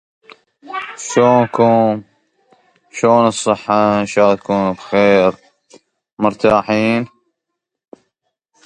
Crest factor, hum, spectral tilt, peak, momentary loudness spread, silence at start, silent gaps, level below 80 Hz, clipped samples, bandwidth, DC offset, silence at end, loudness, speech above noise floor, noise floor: 16 dB; none; -5.5 dB/octave; 0 dBFS; 13 LU; 0.65 s; 6.13-6.17 s; -54 dBFS; under 0.1%; 11 kHz; under 0.1%; 1.6 s; -14 LUFS; 65 dB; -78 dBFS